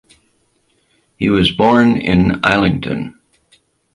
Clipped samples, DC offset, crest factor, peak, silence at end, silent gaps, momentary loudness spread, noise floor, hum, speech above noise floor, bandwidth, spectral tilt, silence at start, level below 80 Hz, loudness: under 0.1%; under 0.1%; 16 dB; 0 dBFS; 0.85 s; none; 11 LU; -61 dBFS; none; 47 dB; 11.5 kHz; -7 dB/octave; 1.2 s; -38 dBFS; -14 LUFS